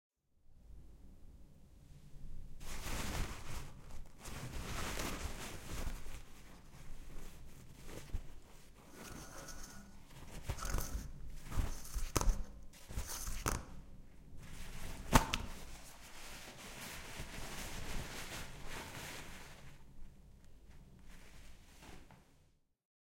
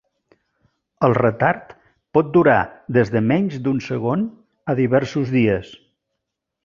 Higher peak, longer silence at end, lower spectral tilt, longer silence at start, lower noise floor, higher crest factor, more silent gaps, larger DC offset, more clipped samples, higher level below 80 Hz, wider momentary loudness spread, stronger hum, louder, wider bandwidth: second, -10 dBFS vs -2 dBFS; second, 0.6 s vs 0.9 s; second, -3.5 dB/octave vs -8.5 dB/octave; second, 0.5 s vs 1 s; second, -71 dBFS vs -80 dBFS; first, 34 dB vs 18 dB; neither; neither; neither; first, -46 dBFS vs -52 dBFS; first, 20 LU vs 9 LU; neither; second, -44 LUFS vs -19 LUFS; first, 16.5 kHz vs 7.2 kHz